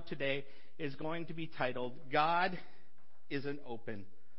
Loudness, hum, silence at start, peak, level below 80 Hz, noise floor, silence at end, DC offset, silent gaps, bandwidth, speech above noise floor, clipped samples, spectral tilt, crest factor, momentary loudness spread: -38 LUFS; none; 0 s; -18 dBFS; -74 dBFS; -71 dBFS; 0.35 s; 1%; none; 5.8 kHz; 33 dB; under 0.1%; -3 dB/octave; 22 dB; 14 LU